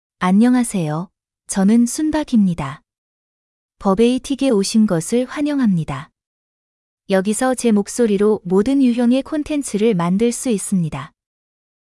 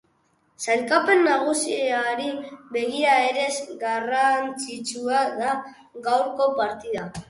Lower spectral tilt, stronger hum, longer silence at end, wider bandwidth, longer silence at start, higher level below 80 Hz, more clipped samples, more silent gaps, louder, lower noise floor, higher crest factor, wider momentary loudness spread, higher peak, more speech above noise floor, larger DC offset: first, -6 dB/octave vs -2.5 dB/octave; neither; first, 0.9 s vs 0.05 s; about the same, 12 kHz vs 11.5 kHz; second, 0.2 s vs 0.6 s; first, -48 dBFS vs -64 dBFS; neither; first, 2.98-3.69 s, 6.27-6.97 s vs none; first, -17 LUFS vs -23 LUFS; first, under -90 dBFS vs -66 dBFS; about the same, 16 dB vs 18 dB; about the same, 10 LU vs 12 LU; about the same, -2 dBFS vs -4 dBFS; first, over 74 dB vs 42 dB; neither